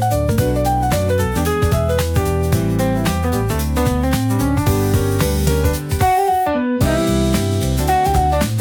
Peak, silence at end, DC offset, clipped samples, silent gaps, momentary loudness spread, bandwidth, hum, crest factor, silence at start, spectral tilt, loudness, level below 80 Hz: -4 dBFS; 0 s; under 0.1%; under 0.1%; none; 2 LU; 19.5 kHz; none; 12 dB; 0 s; -6 dB/octave; -17 LUFS; -26 dBFS